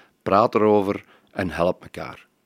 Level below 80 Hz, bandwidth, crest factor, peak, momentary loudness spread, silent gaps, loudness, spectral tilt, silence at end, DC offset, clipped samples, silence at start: -52 dBFS; 15.5 kHz; 20 dB; -2 dBFS; 18 LU; none; -21 LUFS; -7.5 dB/octave; 0.3 s; under 0.1%; under 0.1%; 0.25 s